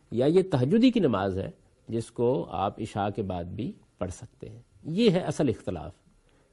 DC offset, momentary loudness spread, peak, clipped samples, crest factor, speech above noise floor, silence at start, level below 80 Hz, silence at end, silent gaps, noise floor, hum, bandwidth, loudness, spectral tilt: under 0.1%; 19 LU; -8 dBFS; under 0.1%; 18 dB; 35 dB; 0.1 s; -56 dBFS; 0.6 s; none; -62 dBFS; none; 11.5 kHz; -27 LUFS; -7 dB/octave